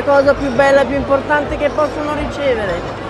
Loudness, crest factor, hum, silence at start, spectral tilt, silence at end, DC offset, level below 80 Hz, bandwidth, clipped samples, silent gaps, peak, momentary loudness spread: -15 LUFS; 14 dB; none; 0 s; -6 dB/octave; 0 s; under 0.1%; -34 dBFS; 11.5 kHz; under 0.1%; none; 0 dBFS; 7 LU